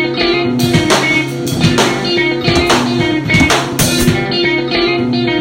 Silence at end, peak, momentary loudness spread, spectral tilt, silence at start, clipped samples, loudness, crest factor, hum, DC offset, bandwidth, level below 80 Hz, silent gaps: 0 s; 0 dBFS; 3 LU; -4 dB/octave; 0 s; under 0.1%; -12 LUFS; 12 dB; none; under 0.1%; 17 kHz; -32 dBFS; none